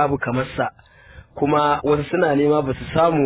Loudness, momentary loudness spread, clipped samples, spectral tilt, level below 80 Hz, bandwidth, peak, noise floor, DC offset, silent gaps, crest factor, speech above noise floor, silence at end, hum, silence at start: -20 LUFS; 8 LU; under 0.1%; -11 dB/octave; -44 dBFS; 4 kHz; -4 dBFS; -45 dBFS; under 0.1%; none; 16 dB; 26 dB; 0 s; none; 0 s